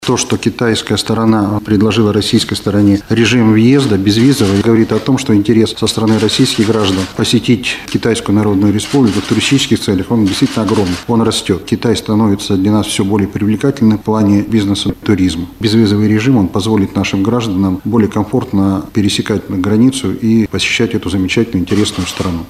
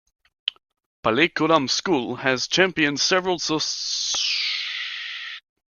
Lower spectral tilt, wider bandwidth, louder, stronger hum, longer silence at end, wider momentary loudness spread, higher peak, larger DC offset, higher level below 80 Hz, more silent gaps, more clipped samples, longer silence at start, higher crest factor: first, -5.5 dB/octave vs -2.5 dB/octave; first, 15 kHz vs 10 kHz; first, -12 LUFS vs -22 LUFS; neither; second, 0.05 s vs 0.3 s; second, 4 LU vs 11 LU; about the same, 0 dBFS vs -2 dBFS; neither; first, -40 dBFS vs -62 dBFS; second, none vs 0.86-1.03 s; neither; second, 0 s vs 0.45 s; second, 12 dB vs 22 dB